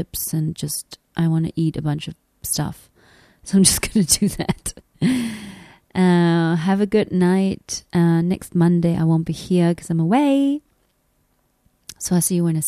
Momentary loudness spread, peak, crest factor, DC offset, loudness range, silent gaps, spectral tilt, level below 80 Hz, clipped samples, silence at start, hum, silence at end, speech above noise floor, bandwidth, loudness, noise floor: 12 LU; 0 dBFS; 20 dB; under 0.1%; 3 LU; none; -5.5 dB/octave; -46 dBFS; under 0.1%; 0 s; none; 0 s; 46 dB; 14 kHz; -19 LUFS; -65 dBFS